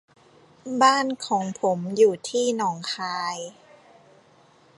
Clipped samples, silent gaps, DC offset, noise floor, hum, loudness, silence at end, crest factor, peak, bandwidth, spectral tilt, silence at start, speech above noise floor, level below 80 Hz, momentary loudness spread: under 0.1%; none; under 0.1%; -56 dBFS; none; -23 LUFS; 1.25 s; 22 dB; -4 dBFS; 11.5 kHz; -4 dB/octave; 0.65 s; 33 dB; -76 dBFS; 13 LU